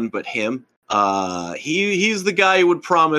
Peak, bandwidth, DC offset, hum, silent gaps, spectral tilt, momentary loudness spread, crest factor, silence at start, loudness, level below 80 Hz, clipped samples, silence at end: -4 dBFS; 12.5 kHz; under 0.1%; none; 0.77-0.82 s; -4 dB/octave; 11 LU; 16 dB; 0 s; -19 LUFS; -68 dBFS; under 0.1%; 0 s